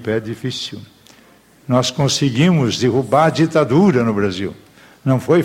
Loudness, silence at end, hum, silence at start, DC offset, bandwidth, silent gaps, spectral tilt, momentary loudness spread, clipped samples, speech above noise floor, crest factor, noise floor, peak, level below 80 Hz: -16 LUFS; 0 s; none; 0 s; under 0.1%; 16 kHz; none; -6 dB/octave; 12 LU; under 0.1%; 33 dB; 16 dB; -49 dBFS; -2 dBFS; -52 dBFS